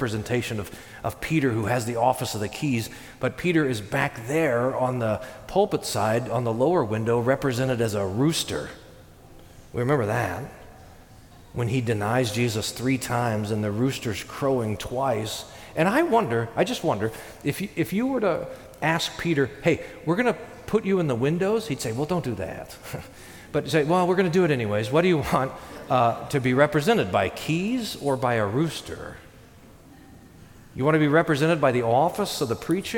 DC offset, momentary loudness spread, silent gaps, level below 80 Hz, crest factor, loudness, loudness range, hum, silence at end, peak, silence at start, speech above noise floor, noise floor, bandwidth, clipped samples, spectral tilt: under 0.1%; 11 LU; none; -52 dBFS; 18 dB; -25 LUFS; 4 LU; none; 0 s; -6 dBFS; 0 s; 25 dB; -49 dBFS; 18 kHz; under 0.1%; -5.5 dB/octave